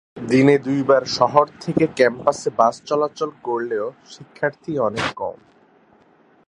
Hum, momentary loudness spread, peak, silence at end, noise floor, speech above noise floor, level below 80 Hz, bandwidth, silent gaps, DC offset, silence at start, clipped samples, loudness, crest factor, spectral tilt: none; 9 LU; 0 dBFS; 1.15 s; -55 dBFS; 35 dB; -58 dBFS; 11 kHz; none; under 0.1%; 0.15 s; under 0.1%; -20 LUFS; 20 dB; -5.5 dB/octave